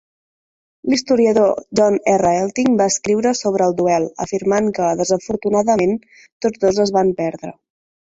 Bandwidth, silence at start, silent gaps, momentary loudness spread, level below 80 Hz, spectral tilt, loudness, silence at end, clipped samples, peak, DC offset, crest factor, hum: 8 kHz; 0.85 s; 6.32-6.40 s; 8 LU; -54 dBFS; -5 dB/octave; -17 LUFS; 0.55 s; under 0.1%; -2 dBFS; under 0.1%; 14 dB; none